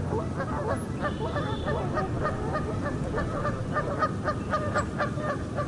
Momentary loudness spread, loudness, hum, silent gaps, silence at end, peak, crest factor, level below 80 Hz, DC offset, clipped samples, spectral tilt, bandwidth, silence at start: 3 LU; -30 LUFS; none; none; 0 s; -14 dBFS; 14 dB; -42 dBFS; under 0.1%; under 0.1%; -7 dB/octave; 11.5 kHz; 0 s